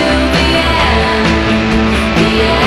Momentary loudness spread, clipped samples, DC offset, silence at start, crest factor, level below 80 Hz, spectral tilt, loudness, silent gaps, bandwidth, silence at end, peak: 1 LU; under 0.1%; under 0.1%; 0 s; 10 dB; -20 dBFS; -5.5 dB/octave; -11 LUFS; none; 13.5 kHz; 0 s; 0 dBFS